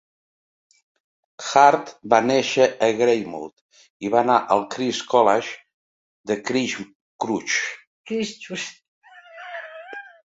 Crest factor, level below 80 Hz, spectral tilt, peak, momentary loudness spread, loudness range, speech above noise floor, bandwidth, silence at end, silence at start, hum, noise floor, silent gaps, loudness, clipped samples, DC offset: 22 dB; -68 dBFS; -3.5 dB/octave; -2 dBFS; 19 LU; 8 LU; 21 dB; 8 kHz; 0.3 s; 1.4 s; none; -41 dBFS; 3.53-3.69 s, 3.90-4.00 s, 5.74-6.24 s, 6.95-7.19 s, 7.87-8.04 s, 8.88-9.01 s; -21 LUFS; under 0.1%; under 0.1%